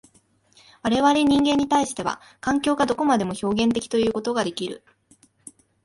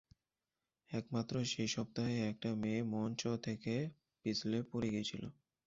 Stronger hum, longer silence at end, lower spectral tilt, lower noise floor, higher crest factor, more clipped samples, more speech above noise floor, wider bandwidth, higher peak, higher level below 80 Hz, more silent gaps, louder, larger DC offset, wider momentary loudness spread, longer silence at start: neither; first, 1.05 s vs 0.35 s; about the same, -4.5 dB/octave vs -5.5 dB/octave; second, -61 dBFS vs under -90 dBFS; about the same, 16 dB vs 16 dB; neither; second, 39 dB vs over 51 dB; first, 11.5 kHz vs 7.6 kHz; first, -6 dBFS vs -26 dBFS; first, -54 dBFS vs -70 dBFS; neither; first, -22 LUFS vs -40 LUFS; neither; first, 11 LU vs 7 LU; about the same, 0.85 s vs 0.9 s